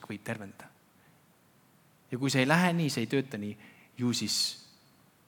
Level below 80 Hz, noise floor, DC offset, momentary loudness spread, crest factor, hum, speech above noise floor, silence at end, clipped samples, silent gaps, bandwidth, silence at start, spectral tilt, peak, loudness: -82 dBFS; -64 dBFS; under 0.1%; 21 LU; 24 dB; none; 34 dB; 0.65 s; under 0.1%; none; 19 kHz; 0 s; -4.5 dB/octave; -8 dBFS; -30 LUFS